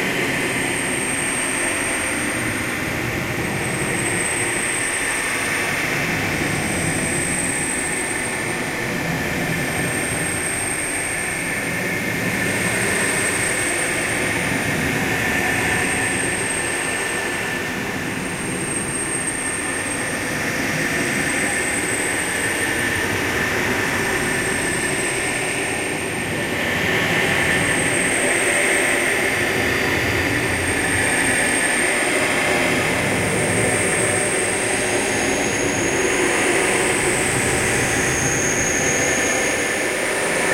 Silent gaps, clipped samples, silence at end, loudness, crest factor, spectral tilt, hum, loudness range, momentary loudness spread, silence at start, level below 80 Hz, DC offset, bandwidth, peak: none; under 0.1%; 0 s; -19 LUFS; 16 dB; -3 dB/octave; none; 4 LU; 5 LU; 0 s; -42 dBFS; under 0.1%; 16 kHz; -6 dBFS